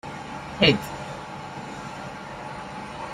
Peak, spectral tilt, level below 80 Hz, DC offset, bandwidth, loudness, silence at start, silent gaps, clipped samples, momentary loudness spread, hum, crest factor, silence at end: -4 dBFS; -5 dB/octave; -52 dBFS; under 0.1%; 14 kHz; -28 LUFS; 0.05 s; none; under 0.1%; 16 LU; 50 Hz at -55 dBFS; 26 dB; 0 s